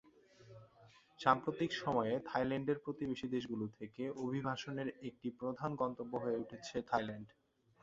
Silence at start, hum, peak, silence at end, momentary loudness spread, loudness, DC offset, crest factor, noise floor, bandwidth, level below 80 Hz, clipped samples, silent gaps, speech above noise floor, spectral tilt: 0.4 s; none; -14 dBFS; 0.55 s; 10 LU; -39 LUFS; under 0.1%; 26 dB; -65 dBFS; 7.8 kHz; -72 dBFS; under 0.1%; none; 26 dB; -4.5 dB/octave